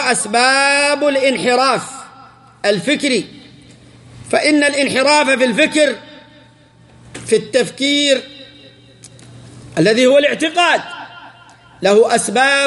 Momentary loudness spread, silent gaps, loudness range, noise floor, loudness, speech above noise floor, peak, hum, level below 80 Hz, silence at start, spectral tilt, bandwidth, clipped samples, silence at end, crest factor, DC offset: 15 LU; none; 4 LU; -46 dBFS; -14 LUFS; 33 dB; 0 dBFS; none; -58 dBFS; 0 s; -3 dB/octave; 11.5 kHz; under 0.1%; 0 s; 16 dB; under 0.1%